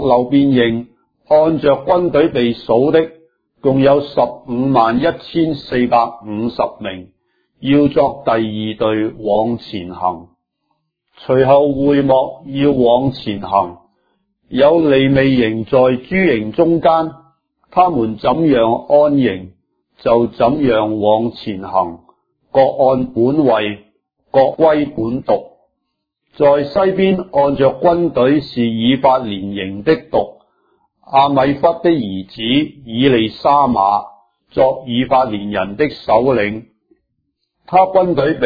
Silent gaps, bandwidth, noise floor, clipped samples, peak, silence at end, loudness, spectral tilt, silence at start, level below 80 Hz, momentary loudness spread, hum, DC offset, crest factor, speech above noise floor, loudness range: none; 5 kHz; -73 dBFS; under 0.1%; 0 dBFS; 0 s; -14 LUFS; -9.5 dB/octave; 0 s; -46 dBFS; 10 LU; none; under 0.1%; 14 dB; 60 dB; 3 LU